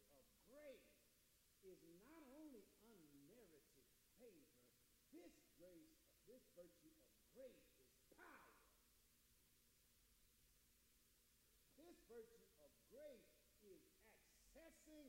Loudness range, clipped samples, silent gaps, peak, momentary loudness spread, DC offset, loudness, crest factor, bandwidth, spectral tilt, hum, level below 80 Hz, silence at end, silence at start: 2 LU; under 0.1%; none; -52 dBFS; 5 LU; under 0.1%; -67 LUFS; 18 dB; 16 kHz; -4 dB/octave; none; -86 dBFS; 0 s; 0 s